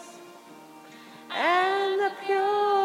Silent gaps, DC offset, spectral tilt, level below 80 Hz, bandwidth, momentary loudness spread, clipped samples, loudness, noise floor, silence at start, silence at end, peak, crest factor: none; under 0.1%; -3 dB/octave; under -90 dBFS; 15 kHz; 24 LU; under 0.1%; -25 LUFS; -48 dBFS; 0 s; 0 s; -10 dBFS; 16 dB